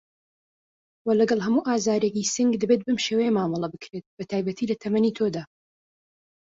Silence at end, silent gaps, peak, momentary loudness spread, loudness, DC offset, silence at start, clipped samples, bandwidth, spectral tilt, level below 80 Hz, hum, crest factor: 1 s; 4.06-4.17 s; -8 dBFS; 11 LU; -24 LUFS; under 0.1%; 1.05 s; under 0.1%; 8 kHz; -5 dB/octave; -66 dBFS; none; 16 dB